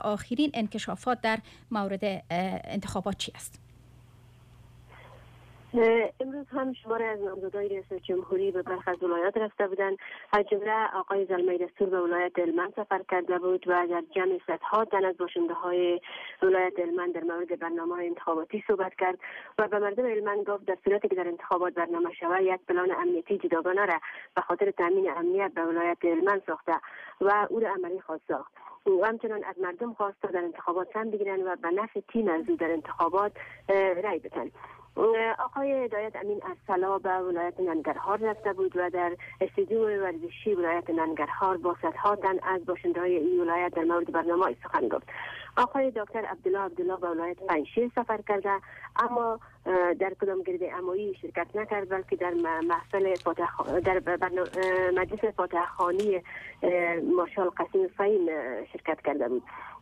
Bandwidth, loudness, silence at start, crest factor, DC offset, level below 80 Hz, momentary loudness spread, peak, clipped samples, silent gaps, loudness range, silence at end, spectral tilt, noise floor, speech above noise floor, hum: 11.5 kHz; -29 LUFS; 0 s; 14 dB; under 0.1%; -64 dBFS; 7 LU; -16 dBFS; under 0.1%; none; 3 LU; 0.05 s; -6 dB/octave; -55 dBFS; 26 dB; none